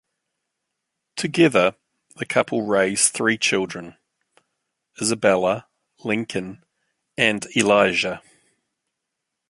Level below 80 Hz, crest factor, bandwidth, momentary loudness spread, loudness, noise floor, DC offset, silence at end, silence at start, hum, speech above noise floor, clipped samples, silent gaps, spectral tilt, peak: -62 dBFS; 22 dB; 11.5 kHz; 17 LU; -20 LUFS; -81 dBFS; under 0.1%; 1.3 s; 1.15 s; none; 60 dB; under 0.1%; none; -3 dB/octave; 0 dBFS